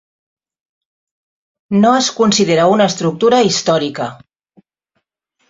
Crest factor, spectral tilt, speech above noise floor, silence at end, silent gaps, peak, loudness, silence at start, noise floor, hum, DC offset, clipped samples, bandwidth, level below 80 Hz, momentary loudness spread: 14 dB; -4.5 dB/octave; 57 dB; 1.35 s; none; -2 dBFS; -13 LUFS; 1.7 s; -70 dBFS; none; under 0.1%; under 0.1%; 7.8 kHz; -58 dBFS; 8 LU